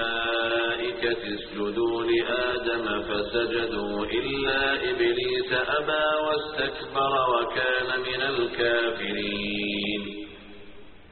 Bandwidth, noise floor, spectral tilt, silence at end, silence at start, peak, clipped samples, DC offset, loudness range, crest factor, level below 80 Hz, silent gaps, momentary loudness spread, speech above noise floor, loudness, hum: 4.5 kHz; -47 dBFS; -1.5 dB/octave; 0 s; 0 s; -12 dBFS; under 0.1%; 0.2%; 2 LU; 16 dB; -50 dBFS; none; 5 LU; 21 dB; -26 LUFS; none